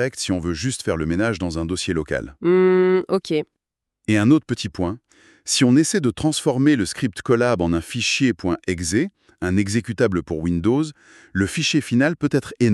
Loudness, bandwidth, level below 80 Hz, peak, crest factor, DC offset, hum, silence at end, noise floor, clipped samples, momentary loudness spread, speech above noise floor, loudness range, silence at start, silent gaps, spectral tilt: -20 LUFS; 13 kHz; -48 dBFS; -4 dBFS; 16 dB; under 0.1%; none; 0 s; -82 dBFS; under 0.1%; 9 LU; 62 dB; 2 LU; 0 s; none; -5 dB/octave